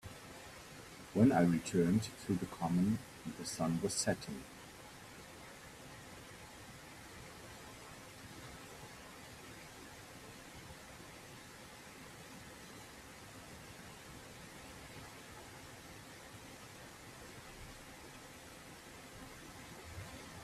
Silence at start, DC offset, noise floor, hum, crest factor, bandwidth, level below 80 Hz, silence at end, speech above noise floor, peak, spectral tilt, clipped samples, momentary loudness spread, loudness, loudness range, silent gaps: 0.05 s; under 0.1%; -54 dBFS; none; 24 dB; 15 kHz; -66 dBFS; 0 s; 20 dB; -18 dBFS; -5.5 dB/octave; under 0.1%; 18 LU; -40 LUFS; 17 LU; none